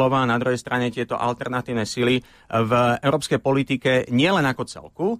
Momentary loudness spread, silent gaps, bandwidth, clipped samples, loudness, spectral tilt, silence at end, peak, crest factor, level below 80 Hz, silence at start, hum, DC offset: 7 LU; none; 14.5 kHz; under 0.1%; -22 LUFS; -5.5 dB/octave; 0 s; -8 dBFS; 14 dB; -54 dBFS; 0 s; none; under 0.1%